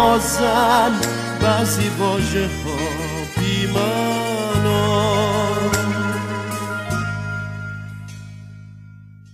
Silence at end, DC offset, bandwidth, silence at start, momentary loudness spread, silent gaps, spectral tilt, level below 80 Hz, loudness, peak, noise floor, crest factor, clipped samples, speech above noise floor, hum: 0 s; under 0.1%; 15.5 kHz; 0 s; 15 LU; none; -4.5 dB/octave; -40 dBFS; -20 LUFS; -2 dBFS; -41 dBFS; 18 dB; under 0.1%; 23 dB; 50 Hz at -50 dBFS